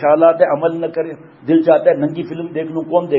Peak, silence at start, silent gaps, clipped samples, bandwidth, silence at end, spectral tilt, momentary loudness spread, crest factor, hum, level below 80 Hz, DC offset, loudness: 0 dBFS; 0 s; none; under 0.1%; 5.4 kHz; 0 s; -10 dB/octave; 12 LU; 14 dB; none; -66 dBFS; under 0.1%; -15 LUFS